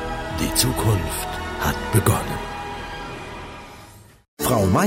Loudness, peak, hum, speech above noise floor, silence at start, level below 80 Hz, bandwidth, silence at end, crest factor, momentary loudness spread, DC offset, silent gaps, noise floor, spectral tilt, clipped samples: -23 LUFS; -4 dBFS; none; 25 dB; 0 s; -36 dBFS; 16.5 kHz; 0 s; 20 dB; 16 LU; under 0.1%; 4.28-4.37 s; -45 dBFS; -4.5 dB/octave; under 0.1%